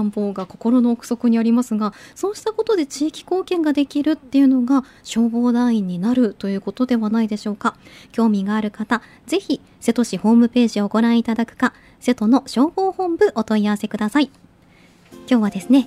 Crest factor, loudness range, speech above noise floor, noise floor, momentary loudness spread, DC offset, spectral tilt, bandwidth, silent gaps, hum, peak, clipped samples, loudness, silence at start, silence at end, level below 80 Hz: 16 dB; 3 LU; 32 dB; -51 dBFS; 8 LU; under 0.1%; -6 dB/octave; 13 kHz; none; none; -4 dBFS; under 0.1%; -19 LUFS; 0 s; 0 s; -58 dBFS